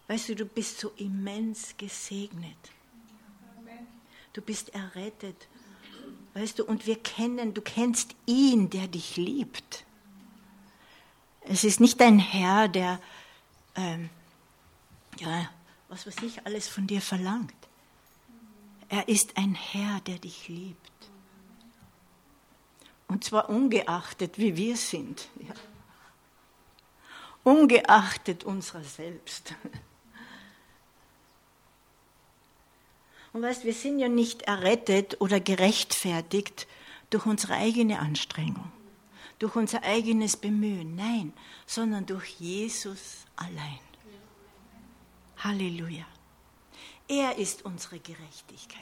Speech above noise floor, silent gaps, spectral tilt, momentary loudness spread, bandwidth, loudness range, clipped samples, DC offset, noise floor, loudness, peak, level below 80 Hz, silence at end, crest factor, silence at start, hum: 35 dB; none; -4 dB/octave; 23 LU; 16.5 kHz; 15 LU; under 0.1%; under 0.1%; -62 dBFS; -27 LUFS; -4 dBFS; -68 dBFS; 0 s; 26 dB; 0.1 s; none